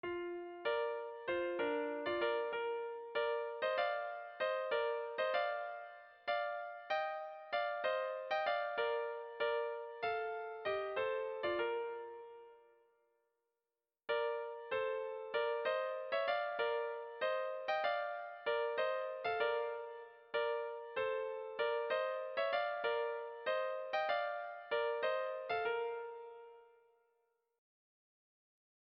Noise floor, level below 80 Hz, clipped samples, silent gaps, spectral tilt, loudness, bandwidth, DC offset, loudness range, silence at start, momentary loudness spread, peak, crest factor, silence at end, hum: under -90 dBFS; -80 dBFS; under 0.1%; none; 0 dB/octave; -39 LUFS; 6 kHz; under 0.1%; 5 LU; 0.05 s; 7 LU; -24 dBFS; 16 dB; 2.3 s; none